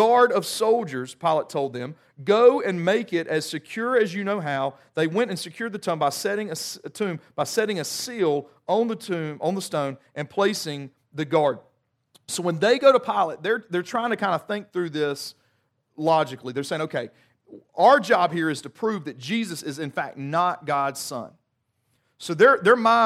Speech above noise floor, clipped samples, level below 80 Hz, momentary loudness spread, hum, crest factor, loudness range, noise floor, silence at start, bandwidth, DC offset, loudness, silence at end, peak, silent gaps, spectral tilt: 51 dB; under 0.1%; -76 dBFS; 14 LU; none; 20 dB; 4 LU; -74 dBFS; 0 s; 15.5 kHz; under 0.1%; -24 LUFS; 0 s; -4 dBFS; none; -4.5 dB/octave